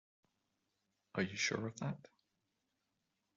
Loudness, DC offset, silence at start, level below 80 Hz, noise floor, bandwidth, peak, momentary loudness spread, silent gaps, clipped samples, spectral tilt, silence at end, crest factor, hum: -40 LUFS; under 0.1%; 1.15 s; -80 dBFS; -86 dBFS; 7.4 kHz; -24 dBFS; 9 LU; none; under 0.1%; -4 dB/octave; 1.4 s; 22 dB; none